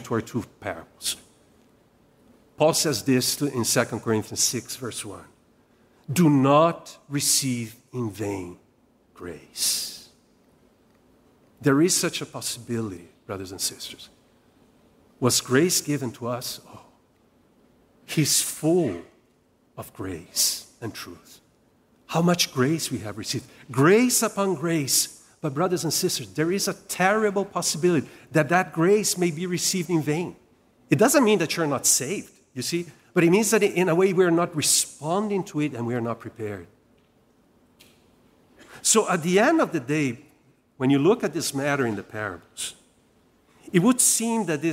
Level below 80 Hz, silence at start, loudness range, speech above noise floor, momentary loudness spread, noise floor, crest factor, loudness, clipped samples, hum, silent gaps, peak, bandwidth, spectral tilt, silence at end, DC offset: -66 dBFS; 0 s; 7 LU; 39 dB; 16 LU; -63 dBFS; 20 dB; -23 LUFS; under 0.1%; none; none; -6 dBFS; 16 kHz; -3.5 dB/octave; 0 s; under 0.1%